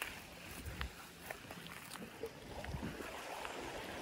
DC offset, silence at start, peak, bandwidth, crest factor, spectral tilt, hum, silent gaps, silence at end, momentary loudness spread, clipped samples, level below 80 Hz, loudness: under 0.1%; 0 s; -22 dBFS; 16 kHz; 24 dB; -4 dB/octave; none; none; 0 s; 4 LU; under 0.1%; -56 dBFS; -47 LUFS